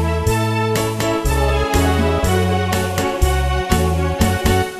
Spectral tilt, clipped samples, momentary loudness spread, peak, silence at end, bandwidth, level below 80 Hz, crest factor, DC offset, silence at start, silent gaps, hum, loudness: -5.5 dB/octave; under 0.1%; 2 LU; -2 dBFS; 0 s; 14 kHz; -24 dBFS; 16 dB; under 0.1%; 0 s; none; none; -17 LUFS